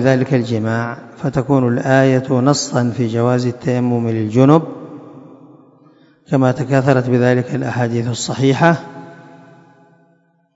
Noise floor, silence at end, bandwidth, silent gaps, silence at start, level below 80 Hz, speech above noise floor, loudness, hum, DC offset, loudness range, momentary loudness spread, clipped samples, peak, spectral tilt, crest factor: -57 dBFS; 1.35 s; 8 kHz; none; 0 s; -54 dBFS; 42 dB; -16 LUFS; none; under 0.1%; 3 LU; 9 LU; under 0.1%; 0 dBFS; -6.5 dB/octave; 16 dB